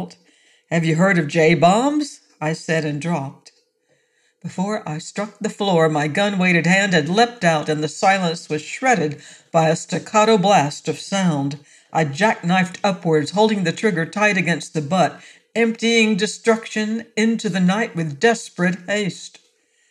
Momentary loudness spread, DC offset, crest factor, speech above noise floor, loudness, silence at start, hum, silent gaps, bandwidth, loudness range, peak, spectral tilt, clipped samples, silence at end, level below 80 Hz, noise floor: 11 LU; under 0.1%; 16 dB; 46 dB; -19 LUFS; 0 s; none; none; 11.5 kHz; 5 LU; -4 dBFS; -5 dB/octave; under 0.1%; 0.6 s; -66 dBFS; -64 dBFS